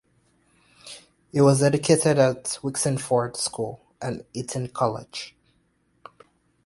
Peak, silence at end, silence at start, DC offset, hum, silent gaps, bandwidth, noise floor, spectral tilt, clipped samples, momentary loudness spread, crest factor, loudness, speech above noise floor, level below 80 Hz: -4 dBFS; 1.35 s; 0.85 s; under 0.1%; none; none; 11.5 kHz; -67 dBFS; -5 dB/octave; under 0.1%; 19 LU; 20 dB; -23 LUFS; 44 dB; -60 dBFS